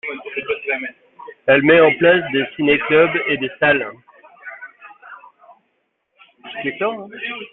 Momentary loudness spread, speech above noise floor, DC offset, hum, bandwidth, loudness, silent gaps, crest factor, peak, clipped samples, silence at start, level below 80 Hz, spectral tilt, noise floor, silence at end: 23 LU; 53 dB; under 0.1%; none; 4.1 kHz; -17 LUFS; none; 18 dB; -2 dBFS; under 0.1%; 0.05 s; -58 dBFS; -9.5 dB/octave; -69 dBFS; 0.05 s